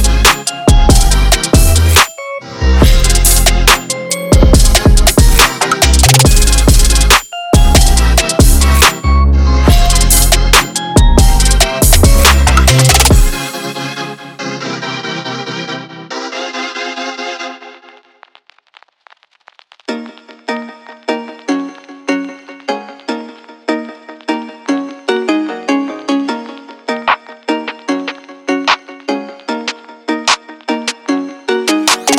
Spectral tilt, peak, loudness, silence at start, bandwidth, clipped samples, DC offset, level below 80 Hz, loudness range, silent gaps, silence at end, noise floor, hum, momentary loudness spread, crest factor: -3.5 dB/octave; 0 dBFS; -11 LUFS; 0 s; 19 kHz; under 0.1%; under 0.1%; -14 dBFS; 15 LU; none; 0 s; -48 dBFS; none; 16 LU; 10 dB